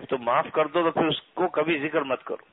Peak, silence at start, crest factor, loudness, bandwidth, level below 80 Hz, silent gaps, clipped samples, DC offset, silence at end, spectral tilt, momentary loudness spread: -8 dBFS; 0 s; 18 dB; -25 LUFS; 4.1 kHz; -64 dBFS; none; under 0.1%; under 0.1%; 0.15 s; -9.5 dB/octave; 4 LU